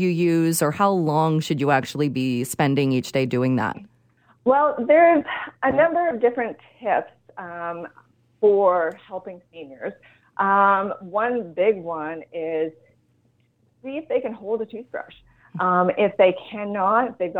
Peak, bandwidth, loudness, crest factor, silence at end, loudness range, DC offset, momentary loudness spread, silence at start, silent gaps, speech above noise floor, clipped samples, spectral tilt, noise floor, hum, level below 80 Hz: -4 dBFS; 19 kHz; -21 LUFS; 18 dB; 0 s; 7 LU; under 0.1%; 18 LU; 0 s; none; 42 dB; under 0.1%; -6 dB/octave; -64 dBFS; none; -64 dBFS